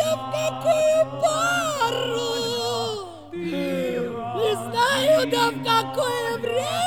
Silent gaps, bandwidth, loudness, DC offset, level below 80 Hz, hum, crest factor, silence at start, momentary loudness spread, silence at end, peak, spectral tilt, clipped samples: none; 19.5 kHz; -23 LUFS; 0.2%; -62 dBFS; none; 14 dB; 0 s; 9 LU; 0 s; -8 dBFS; -3.5 dB/octave; under 0.1%